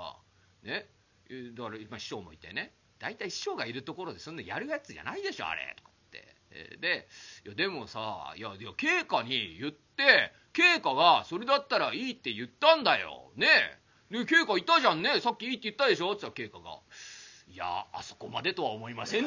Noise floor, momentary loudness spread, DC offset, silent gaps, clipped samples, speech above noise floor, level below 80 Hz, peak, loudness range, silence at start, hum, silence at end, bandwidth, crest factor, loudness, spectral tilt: -63 dBFS; 21 LU; under 0.1%; none; under 0.1%; 32 dB; -70 dBFS; -6 dBFS; 13 LU; 0 s; none; 0 s; 7.6 kHz; 24 dB; -28 LUFS; -3 dB/octave